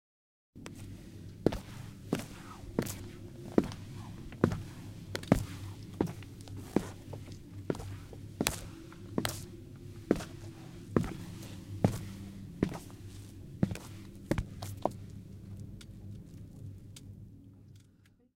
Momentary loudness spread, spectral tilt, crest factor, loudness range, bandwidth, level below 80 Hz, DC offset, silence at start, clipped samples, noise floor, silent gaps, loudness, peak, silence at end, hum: 16 LU; -6 dB/octave; 36 dB; 6 LU; 16.5 kHz; -52 dBFS; under 0.1%; 0.55 s; under 0.1%; -64 dBFS; none; -38 LUFS; -2 dBFS; 0.3 s; none